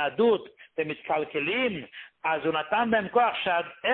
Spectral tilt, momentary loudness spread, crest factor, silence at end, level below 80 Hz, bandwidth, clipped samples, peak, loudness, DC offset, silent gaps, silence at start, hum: -9 dB/octave; 9 LU; 16 dB; 0 s; -66 dBFS; 4.3 kHz; under 0.1%; -10 dBFS; -27 LUFS; under 0.1%; none; 0 s; none